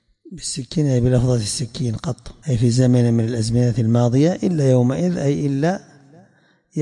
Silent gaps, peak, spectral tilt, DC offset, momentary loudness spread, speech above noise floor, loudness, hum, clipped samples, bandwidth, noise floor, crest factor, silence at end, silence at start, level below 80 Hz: none; -6 dBFS; -6.5 dB/octave; under 0.1%; 11 LU; 39 dB; -19 LUFS; none; under 0.1%; 11.5 kHz; -57 dBFS; 14 dB; 0 s; 0.25 s; -44 dBFS